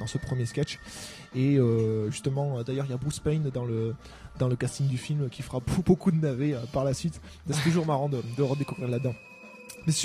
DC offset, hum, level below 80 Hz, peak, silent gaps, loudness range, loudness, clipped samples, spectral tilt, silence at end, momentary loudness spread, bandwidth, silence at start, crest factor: under 0.1%; none; -50 dBFS; -8 dBFS; none; 2 LU; -29 LUFS; under 0.1%; -6.5 dB/octave; 0 s; 13 LU; 14.5 kHz; 0 s; 20 dB